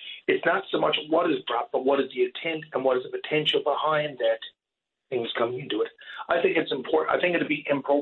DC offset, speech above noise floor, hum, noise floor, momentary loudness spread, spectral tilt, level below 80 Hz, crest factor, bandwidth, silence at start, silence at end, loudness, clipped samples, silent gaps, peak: under 0.1%; 61 dB; none; -86 dBFS; 6 LU; -6.5 dB/octave; -72 dBFS; 18 dB; 7.4 kHz; 0 s; 0 s; -26 LUFS; under 0.1%; none; -8 dBFS